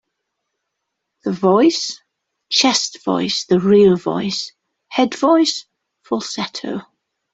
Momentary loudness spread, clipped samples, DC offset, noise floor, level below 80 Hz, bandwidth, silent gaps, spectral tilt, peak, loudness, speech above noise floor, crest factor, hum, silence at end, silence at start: 15 LU; under 0.1%; under 0.1%; -77 dBFS; -60 dBFS; 8.2 kHz; none; -4 dB/octave; -2 dBFS; -17 LUFS; 61 dB; 18 dB; none; 0.5 s; 1.25 s